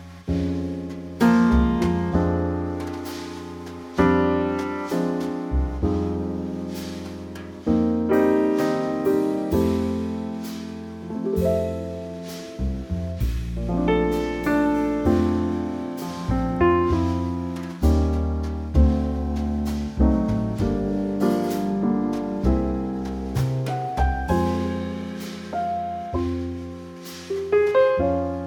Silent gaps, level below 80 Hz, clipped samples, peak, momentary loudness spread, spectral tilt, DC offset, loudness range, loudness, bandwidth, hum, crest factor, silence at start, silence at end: none; -32 dBFS; under 0.1%; -6 dBFS; 13 LU; -7.5 dB/octave; under 0.1%; 4 LU; -24 LUFS; 19.5 kHz; none; 18 dB; 0 s; 0 s